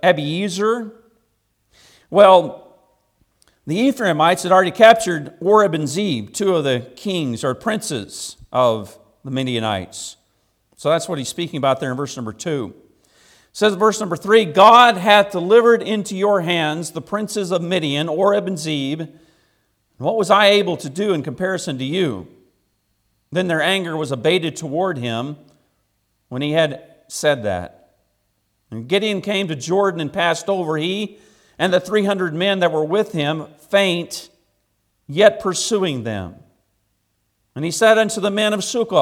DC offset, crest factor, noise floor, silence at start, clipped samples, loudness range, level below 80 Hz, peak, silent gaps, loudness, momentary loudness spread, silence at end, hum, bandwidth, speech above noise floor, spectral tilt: under 0.1%; 18 dB; -68 dBFS; 0.05 s; under 0.1%; 9 LU; -62 dBFS; 0 dBFS; none; -18 LUFS; 15 LU; 0 s; none; 16.5 kHz; 51 dB; -4.5 dB/octave